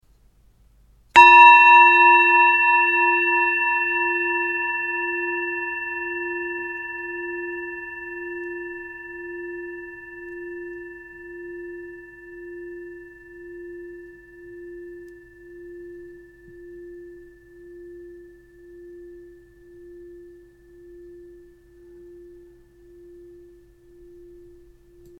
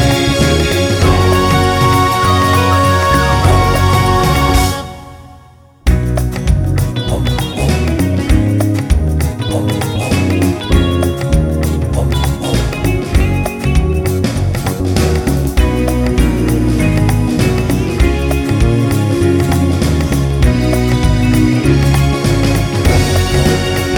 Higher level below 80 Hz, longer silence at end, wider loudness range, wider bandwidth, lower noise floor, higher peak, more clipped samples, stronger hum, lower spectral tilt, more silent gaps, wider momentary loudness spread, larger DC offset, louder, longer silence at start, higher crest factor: second, -58 dBFS vs -18 dBFS; first, 5.1 s vs 0 s; first, 28 LU vs 4 LU; second, 8.6 kHz vs 19.5 kHz; first, -56 dBFS vs -41 dBFS; about the same, 0 dBFS vs 0 dBFS; neither; neither; second, -3 dB/octave vs -6 dB/octave; neither; first, 29 LU vs 5 LU; neither; second, -16 LUFS vs -13 LUFS; first, 1.15 s vs 0 s; first, 22 dB vs 12 dB